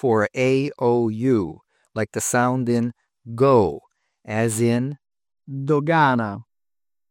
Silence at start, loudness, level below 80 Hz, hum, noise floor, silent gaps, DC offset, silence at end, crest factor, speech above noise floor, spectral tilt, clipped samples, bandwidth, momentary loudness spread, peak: 0.05 s; -21 LUFS; -60 dBFS; none; under -90 dBFS; none; under 0.1%; 0.7 s; 16 dB; over 70 dB; -6 dB/octave; under 0.1%; 17 kHz; 15 LU; -6 dBFS